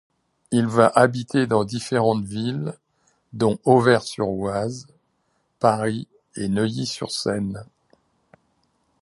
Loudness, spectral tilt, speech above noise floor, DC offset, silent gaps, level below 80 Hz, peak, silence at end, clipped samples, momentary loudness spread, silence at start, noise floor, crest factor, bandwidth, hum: -22 LUFS; -6 dB/octave; 49 dB; under 0.1%; none; -56 dBFS; 0 dBFS; 1.4 s; under 0.1%; 14 LU; 0.5 s; -69 dBFS; 22 dB; 11.5 kHz; none